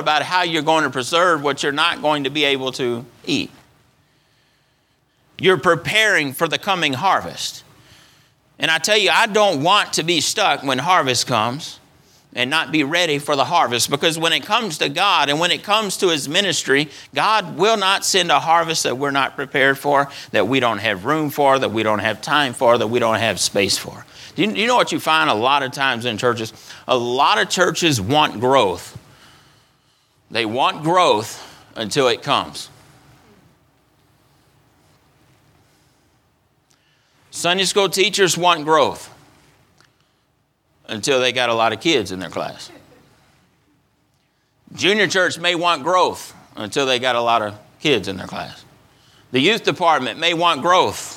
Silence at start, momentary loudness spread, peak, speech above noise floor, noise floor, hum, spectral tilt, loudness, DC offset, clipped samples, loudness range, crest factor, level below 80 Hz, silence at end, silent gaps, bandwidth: 0 s; 11 LU; 0 dBFS; 46 dB; -64 dBFS; none; -3 dB/octave; -17 LUFS; under 0.1%; under 0.1%; 5 LU; 18 dB; -62 dBFS; 0 s; none; 18.5 kHz